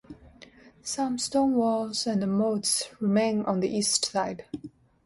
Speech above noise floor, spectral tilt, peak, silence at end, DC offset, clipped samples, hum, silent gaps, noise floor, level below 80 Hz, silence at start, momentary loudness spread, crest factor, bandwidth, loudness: 26 dB; -4 dB/octave; -8 dBFS; 0.4 s; under 0.1%; under 0.1%; none; none; -53 dBFS; -62 dBFS; 0.1 s; 10 LU; 20 dB; 12 kHz; -26 LUFS